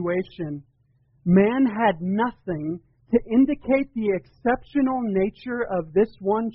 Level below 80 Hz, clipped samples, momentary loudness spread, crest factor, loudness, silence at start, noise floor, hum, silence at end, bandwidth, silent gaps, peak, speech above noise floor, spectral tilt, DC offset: -50 dBFS; under 0.1%; 12 LU; 18 dB; -23 LUFS; 0 s; -63 dBFS; none; 0 s; 5.2 kHz; none; -6 dBFS; 40 dB; -7 dB/octave; under 0.1%